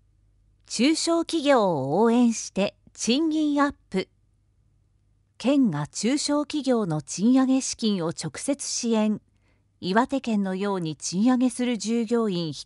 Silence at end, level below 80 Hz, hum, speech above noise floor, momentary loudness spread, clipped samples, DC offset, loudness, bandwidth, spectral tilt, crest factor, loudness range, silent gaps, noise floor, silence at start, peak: 0 s; -62 dBFS; none; 41 dB; 8 LU; under 0.1%; under 0.1%; -24 LUFS; 11.5 kHz; -4.5 dB/octave; 18 dB; 4 LU; none; -65 dBFS; 0.7 s; -6 dBFS